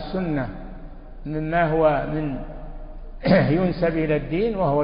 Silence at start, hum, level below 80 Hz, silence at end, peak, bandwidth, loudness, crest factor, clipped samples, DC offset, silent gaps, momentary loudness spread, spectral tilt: 0 s; none; -36 dBFS; 0 s; -4 dBFS; 5.4 kHz; -22 LUFS; 18 dB; under 0.1%; under 0.1%; none; 22 LU; -12 dB/octave